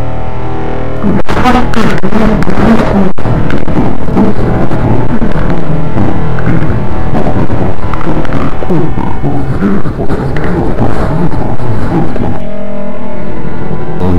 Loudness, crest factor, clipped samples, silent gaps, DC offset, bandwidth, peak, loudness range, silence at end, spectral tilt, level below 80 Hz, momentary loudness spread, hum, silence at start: -13 LUFS; 12 dB; 10%; none; 60%; 10 kHz; 0 dBFS; 4 LU; 0 s; -8 dB/octave; -20 dBFS; 9 LU; none; 0 s